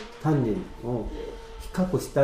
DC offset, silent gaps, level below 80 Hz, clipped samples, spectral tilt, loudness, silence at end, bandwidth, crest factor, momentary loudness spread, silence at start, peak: under 0.1%; none; -42 dBFS; under 0.1%; -7.5 dB/octave; -29 LUFS; 0 s; 15.5 kHz; 16 dB; 13 LU; 0 s; -10 dBFS